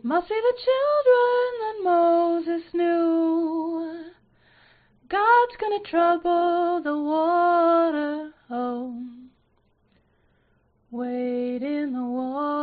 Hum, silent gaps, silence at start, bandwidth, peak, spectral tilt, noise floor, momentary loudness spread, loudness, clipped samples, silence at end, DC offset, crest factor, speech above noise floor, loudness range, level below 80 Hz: none; none; 0.05 s; 4.8 kHz; -8 dBFS; -2 dB/octave; -65 dBFS; 13 LU; -23 LUFS; under 0.1%; 0 s; under 0.1%; 16 dB; 43 dB; 11 LU; -66 dBFS